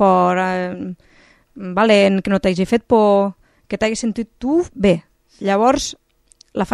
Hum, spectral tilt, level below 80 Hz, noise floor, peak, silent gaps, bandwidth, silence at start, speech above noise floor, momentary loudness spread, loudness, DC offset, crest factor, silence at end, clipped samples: none; -5.5 dB/octave; -46 dBFS; -53 dBFS; 0 dBFS; none; 12 kHz; 0 s; 37 dB; 13 LU; -17 LUFS; under 0.1%; 18 dB; 0 s; under 0.1%